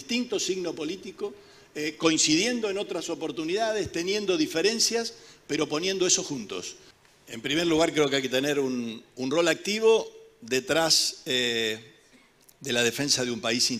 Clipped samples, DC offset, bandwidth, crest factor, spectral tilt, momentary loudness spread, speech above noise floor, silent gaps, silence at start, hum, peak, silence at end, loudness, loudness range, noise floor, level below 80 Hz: under 0.1%; under 0.1%; 16 kHz; 20 dB; -2.5 dB/octave; 14 LU; 32 dB; none; 0 s; none; -8 dBFS; 0 s; -26 LUFS; 2 LU; -58 dBFS; -64 dBFS